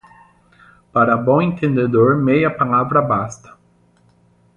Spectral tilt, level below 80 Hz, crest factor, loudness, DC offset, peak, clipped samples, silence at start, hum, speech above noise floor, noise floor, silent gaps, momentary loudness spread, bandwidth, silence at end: -8 dB/octave; -52 dBFS; 16 dB; -16 LUFS; under 0.1%; -2 dBFS; under 0.1%; 0.95 s; none; 40 dB; -55 dBFS; none; 6 LU; 9.2 kHz; 1.2 s